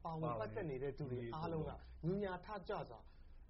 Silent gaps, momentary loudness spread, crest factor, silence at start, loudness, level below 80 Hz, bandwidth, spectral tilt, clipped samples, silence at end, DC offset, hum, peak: none; 7 LU; 14 dB; 0 s; -45 LUFS; -58 dBFS; 5.8 kHz; -7 dB/octave; under 0.1%; 0 s; under 0.1%; none; -30 dBFS